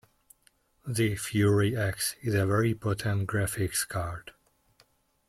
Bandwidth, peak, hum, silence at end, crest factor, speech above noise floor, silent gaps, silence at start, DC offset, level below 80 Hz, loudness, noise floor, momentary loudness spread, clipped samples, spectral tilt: 15.5 kHz; -14 dBFS; none; 1 s; 16 dB; 39 dB; none; 0.85 s; under 0.1%; -56 dBFS; -28 LUFS; -67 dBFS; 10 LU; under 0.1%; -5 dB/octave